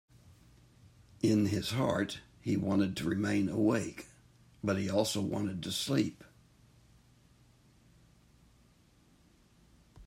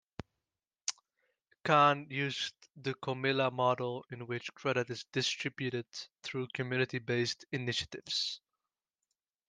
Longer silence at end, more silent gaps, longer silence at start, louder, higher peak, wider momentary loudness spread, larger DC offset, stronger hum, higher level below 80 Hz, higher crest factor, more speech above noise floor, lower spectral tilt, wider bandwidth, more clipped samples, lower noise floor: second, 0 s vs 1.1 s; neither; first, 1.25 s vs 0.85 s; about the same, -33 LUFS vs -34 LUFS; about the same, -14 dBFS vs -12 dBFS; second, 9 LU vs 12 LU; neither; neither; first, -64 dBFS vs -72 dBFS; about the same, 20 dB vs 24 dB; second, 33 dB vs over 56 dB; first, -5.5 dB/octave vs -4 dB/octave; first, 16 kHz vs 10 kHz; neither; second, -65 dBFS vs under -90 dBFS